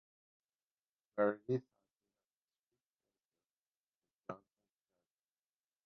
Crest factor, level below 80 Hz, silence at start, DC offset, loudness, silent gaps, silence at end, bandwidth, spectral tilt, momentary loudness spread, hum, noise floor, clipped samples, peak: 26 dB; -90 dBFS; 1.15 s; under 0.1%; -39 LUFS; 2.25-2.48 s, 2.59-2.64 s, 2.86-2.90 s, 3.28-3.32 s, 3.46-3.71 s, 3.77-4.02 s, 4.13-4.22 s; 1.5 s; 4.5 kHz; -7.5 dB/octave; 18 LU; none; under -90 dBFS; under 0.1%; -20 dBFS